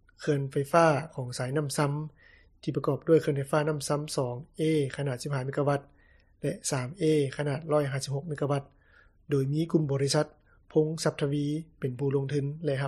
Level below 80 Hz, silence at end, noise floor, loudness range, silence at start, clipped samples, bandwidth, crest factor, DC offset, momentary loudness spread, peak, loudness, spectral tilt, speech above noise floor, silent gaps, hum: -62 dBFS; 0 s; -61 dBFS; 3 LU; 0.2 s; under 0.1%; 13.5 kHz; 20 dB; under 0.1%; 9 LU; -10 dBFS; -29 LUFS; -6 dB/octave; 33 dB; none; none